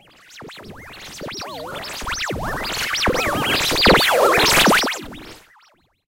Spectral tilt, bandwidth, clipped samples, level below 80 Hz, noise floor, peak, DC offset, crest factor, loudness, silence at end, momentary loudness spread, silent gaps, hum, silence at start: -2.5 dB/octave; 16 kHz; under 0.1%; -38 dBFS; -57 dBFS; 0 dBFS; under 0.1%; 20 dB; -16 LUFS; 0.7 s; 24 LU; none; none; 0.3 s